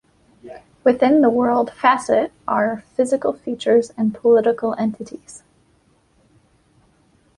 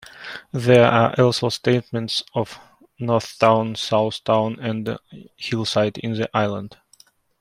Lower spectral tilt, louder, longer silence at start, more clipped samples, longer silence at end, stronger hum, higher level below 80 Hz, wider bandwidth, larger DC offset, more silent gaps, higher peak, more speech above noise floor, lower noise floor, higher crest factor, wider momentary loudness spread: about the same, -5.5 dB/octave vs -6 dB/octave; about the same, -18 LUFS vs -20 LUFS; first, 0.45 s vs 0.15 s; neither; first, 2 s vs 0.7 s; neither; about the same, -60 dBFS vs -60 dBFS; second, 11 kHz vs 14 kHz; neither; neither; about the same, -2 dBFS vs -2 dBFS; first, 41 dB vs 35 dB; first, -59 dBFS vs -55 dBFS; about the same, 18 dB vs 18 dB; second, 9 LU vs 15 LU